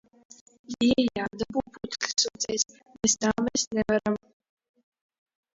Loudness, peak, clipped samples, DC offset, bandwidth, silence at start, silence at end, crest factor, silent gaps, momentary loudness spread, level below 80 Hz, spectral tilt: -27 LUFS; -8 dBFS; under 0.1%; under 0.1%; 7.8 kHz; 0.7 s; 1.4 s; 22 dB; 3.67-3.71 s; 9 LU; -58 dBFS; -2.5 dB/octave